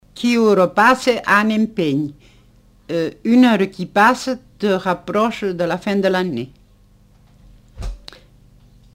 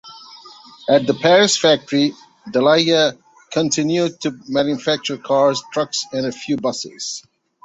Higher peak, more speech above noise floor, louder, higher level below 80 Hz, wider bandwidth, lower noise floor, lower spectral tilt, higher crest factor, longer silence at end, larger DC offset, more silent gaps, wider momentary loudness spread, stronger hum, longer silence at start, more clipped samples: about the same, -2 dBFS vs -2 dBFS; first, 34 dB vs 25 dB; about the same, -17 LUFS vs -18 LUFS; first, -42 dBFS vs -62 dBFS; first, 16 kHz vs 8.2 kHz; first, -51 dBFS vs -42 dBFS; first, -5.5 dB/octave vs -3.5 dB/octave; about the same, 16 dB vs 18 dB; first, 1 s vs 0.45 s; neither; neither; about the same, 15 LU vs 13 LU; first, 50 Hz at -45 dBFS vs none; about the same, 0.15 s vs 0.05 s; neither